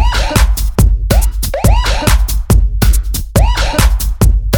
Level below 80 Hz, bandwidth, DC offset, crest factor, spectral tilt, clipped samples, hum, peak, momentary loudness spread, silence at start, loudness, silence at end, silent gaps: -12 dBFS; 20 kHz; under 0.1%; 10 dB; -4.5 dB/octave; under 0.1%; none; 0 dBFS; 3 LU; 0 s; -13 LUFS; 0 s; none